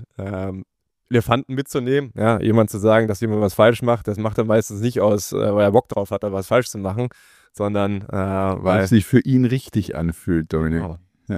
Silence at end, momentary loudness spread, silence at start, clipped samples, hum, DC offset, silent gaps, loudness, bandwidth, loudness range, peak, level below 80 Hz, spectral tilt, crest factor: 0 s; 10 LU; 0 s; under 0.1%; none; under 0.1%; none; -20 LUFS; 15.5 kHz; 3 LU; -2 dBFS; -44 dBFS; -6.5 dB/octave; 18 dB